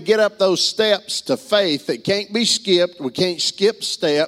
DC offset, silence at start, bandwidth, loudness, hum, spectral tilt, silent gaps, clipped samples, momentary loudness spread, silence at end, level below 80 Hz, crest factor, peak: under 0.1%; 0 s; 16 kHz; -18 LUFS; none; -3 dB/octave; none; under 0.1%; 6 LU; 0 s; -64 dBFS; 16 dB; -2 dBFS